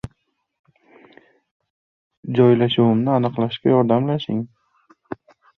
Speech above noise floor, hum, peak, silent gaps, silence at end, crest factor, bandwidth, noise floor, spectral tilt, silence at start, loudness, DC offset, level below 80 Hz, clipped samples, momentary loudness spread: 51 dB; none; -2 dBFS; 0.59-0.64 s, 1.51-1.60 s, 1.70-2.11 s, 2.17-2.23 s; 0.45 s; 18 dB; 4.9 kHz; -68 dBFS; -9.5 dB/octave; 0.05 s; -18 LUFS; under 0.1%; -58 dBFS; under 0.1%; 21 LU